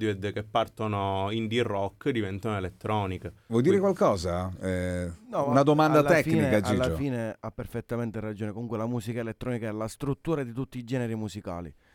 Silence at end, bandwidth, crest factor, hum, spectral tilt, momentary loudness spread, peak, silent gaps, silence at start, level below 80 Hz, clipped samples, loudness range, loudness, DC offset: 0.25 s; 18 kHz; 18 dB; none; -6.5 dB/octave; 12 LU; -8 dBFS; none; 0 s; -54 dBFS; under 0.1%; 8 LU; -28 LUFS; under 0.1%